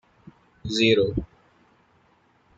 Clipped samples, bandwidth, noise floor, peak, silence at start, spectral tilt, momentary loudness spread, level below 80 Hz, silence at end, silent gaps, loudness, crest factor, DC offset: under 0.1%; 9 kHz; -62 dBFS; -6 dBFS; 0.65 s; -5 dB/octave; 21 LU; -48 dBFS; 1.35 s; none; -22 LUFS; 22 dB; under 0.1%